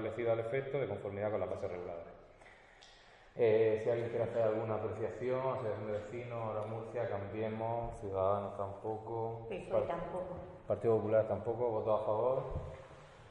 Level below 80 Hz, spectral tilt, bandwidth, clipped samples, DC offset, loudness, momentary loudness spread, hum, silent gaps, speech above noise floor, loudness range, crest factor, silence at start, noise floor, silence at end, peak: -60 dBFS; -8 dB/octave; 9.6 kHz; under 0.1%; under 0.1%; -37 LUFS; 12 LU; none; none; 24 dB; 4 LU; 16 dB; 0 s; -60 dBFS; 0 s; -20 dBFS